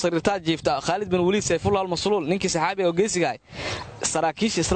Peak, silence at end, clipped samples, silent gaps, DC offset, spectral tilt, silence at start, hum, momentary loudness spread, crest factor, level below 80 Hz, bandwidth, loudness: -8 dBFS; 0 s; under 0.1%; none; under 0.1%; -4 dB/octave; 0 s; none; 5 LU; 16 dB; -48 dBFS; 9.2 kHz; -24 LUFS